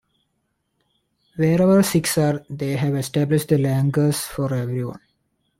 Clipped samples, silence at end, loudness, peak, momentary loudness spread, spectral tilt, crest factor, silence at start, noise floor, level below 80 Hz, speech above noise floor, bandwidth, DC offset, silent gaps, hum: under 0.1%; 0.6 s; -20 LUFS; -6 dBFS; 11 LU; -6 dB/octave; 16 dB; 1.35 s; -72 dBFS; -54 dBFS; 53 dB; 16.5 kHz; under 0.1%; none; none